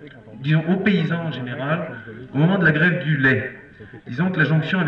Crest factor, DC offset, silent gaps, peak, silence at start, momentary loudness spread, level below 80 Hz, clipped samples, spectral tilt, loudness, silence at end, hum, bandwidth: 14 dB; under 0.1%; none; -6 dBFS; 0 s; 16 LU; -54 dBFS; under 0.1%; -9 dB/octave; -20 LUFS; 0 s; none; 5.8 kHz